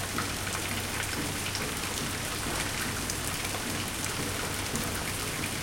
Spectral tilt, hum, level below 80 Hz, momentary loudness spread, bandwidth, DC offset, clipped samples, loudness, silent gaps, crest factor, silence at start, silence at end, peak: -2.5 dB/octave; none; -46 dBFS; 1 LU; 17 kHz; under 0.1%; under 0.1%; -31 LUFS; none; 20 dB; 0 s; 0 s; -12 dBFS